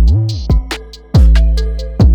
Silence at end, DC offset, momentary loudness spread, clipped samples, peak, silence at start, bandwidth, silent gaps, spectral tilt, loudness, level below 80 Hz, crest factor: 0 s; under 0.1%; 12 LU; under 0.1%; 0 dBFS; 0 s; 8.6 kHz; none; -7 dB/octave; -13 LUFS; -12 dBFS; 10 dB